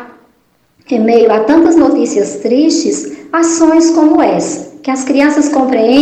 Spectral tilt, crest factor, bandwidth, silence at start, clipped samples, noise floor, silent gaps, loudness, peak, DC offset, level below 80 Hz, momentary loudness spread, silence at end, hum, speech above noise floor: -4 dB/octave; 10 dB; 9 kHz; 0 s; under 0.1%; -54 dBFS; none; -10 LUFS; 0 dBFS; under 0.1%; -50 dBFS; 9 LU; 0 s; none; 45 dB